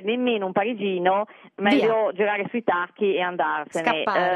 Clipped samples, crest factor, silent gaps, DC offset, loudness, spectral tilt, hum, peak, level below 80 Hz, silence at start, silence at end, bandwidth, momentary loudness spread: under 0.1%; 18 dB; none; under 0.1%; -23 LUFS; -5.5 dB/octave; none; -6 dBFS; -74 dBFS; 0 s; 0 s; 11 kHz; 5 LU